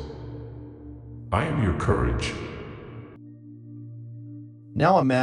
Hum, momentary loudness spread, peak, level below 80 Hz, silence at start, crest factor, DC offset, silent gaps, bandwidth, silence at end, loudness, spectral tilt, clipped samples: none; 22 LU; -6 dBFS; -40 dBFS; 0 s; 20 dB; under 0.1%; none; 10.5 kHz; 0 s; -25 LUFS; -7 dB/octave; under 0.1%